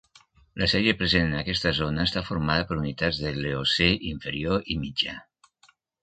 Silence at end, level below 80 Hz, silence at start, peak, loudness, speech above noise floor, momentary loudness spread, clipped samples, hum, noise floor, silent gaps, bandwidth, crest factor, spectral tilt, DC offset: 0.8 s; -42 dBFS; 0.55 s; -6 dBFS; -25 LUFS; 37 dB; 8 LU; under 0.1%; none; -62 dBFS; none; 9.2 kHz; 22 dB; -5.5 dB/octave; under 0.1%